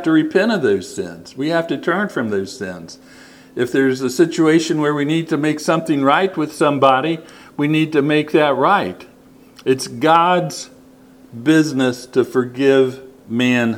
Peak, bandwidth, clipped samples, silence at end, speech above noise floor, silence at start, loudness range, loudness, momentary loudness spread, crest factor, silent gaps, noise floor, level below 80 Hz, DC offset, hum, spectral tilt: 0 dBFS; 16 kHz; under 0.1%; 0 s; 29 dB; 0 s; 4 LU; -17 LUFS; 13 LU; 18 dB; none; -45 dBFS; -62 dBFS; under 0.1%; none; -5.5 dB/octave